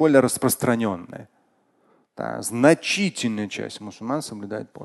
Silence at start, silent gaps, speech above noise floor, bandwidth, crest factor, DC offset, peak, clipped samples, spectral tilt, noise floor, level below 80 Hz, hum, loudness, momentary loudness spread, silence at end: 0 s; none; 41 dB; 12.5 kHz; 22 dB; under 0.1%; -2 dBFS; under 0.1%; -4.5 dB/octave; -64 dBFS; -60 dBFS; none; -23 LUFS; 16 LU; 0 s